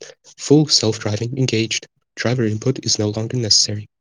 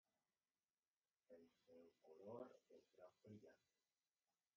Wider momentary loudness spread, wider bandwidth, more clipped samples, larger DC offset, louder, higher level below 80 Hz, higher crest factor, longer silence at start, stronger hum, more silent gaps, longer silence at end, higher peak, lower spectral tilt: about the same, 10 LU vs 10 LU; first, 11 kHz vs 6.8 kHz; neither; neither; first, -18 LUFS vs -63 LUFS; first, -60 dBFS vs under -90 dBFS; second, 18 dB vs 24 dB; second, 0 s vs 1.3 s; neither; neither; second, 0.15 s vs 1 s; first, 0 dBFS vs -44 dBFS; second, -4 dB/octave vs -6.5 dB/octave